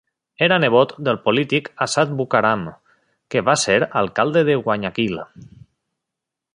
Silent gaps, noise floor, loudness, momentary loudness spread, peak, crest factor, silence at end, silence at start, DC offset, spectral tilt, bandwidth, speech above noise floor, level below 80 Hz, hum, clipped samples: none; -84 dBFS; -18 LUFS; 8 LU; -2 dBFS; 18 dB; 1.1 s; 0.4 s; under 0.1%; -4.5 dB/octave; 11.5 kHz; 65 dB; -58 dBFS; none; under 0.1%